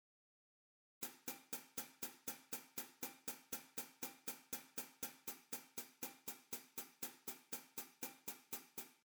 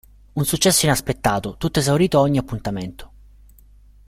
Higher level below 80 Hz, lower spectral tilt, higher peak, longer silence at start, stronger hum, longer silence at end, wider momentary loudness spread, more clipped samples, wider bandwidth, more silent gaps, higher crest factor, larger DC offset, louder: second, -88 dBFS vs -42 dBFS; second, -1 dB/octave vs -4.5 dB/octave; second, -30 dBFS vs -2 dBFS; first, 1 s vs 0.35 s; second, none vs 50 Hz at -40 dBFS; second, 0.1 s vs 1 s; second, 4 LU vs 13 LU; neither; first, over 20 kHz vs 16 kHz; neither; about the same, 22 dB vs 18 dB; neither; second, -49 LUFS vs -19 LUFS